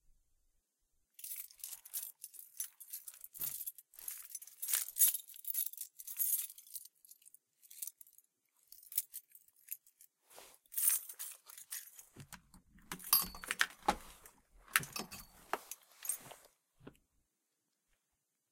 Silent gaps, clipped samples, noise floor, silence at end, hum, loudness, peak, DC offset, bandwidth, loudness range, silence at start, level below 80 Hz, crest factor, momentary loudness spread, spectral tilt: none; under 0.1%; -85 dBFS; 1.6 s; none; -38 LUFS; -8 dBFS; under 0.1%; 17 kHz; 11 LU; 1.2 s; -70 dBFS; 34 dB; 24 LU; 0 dB/octave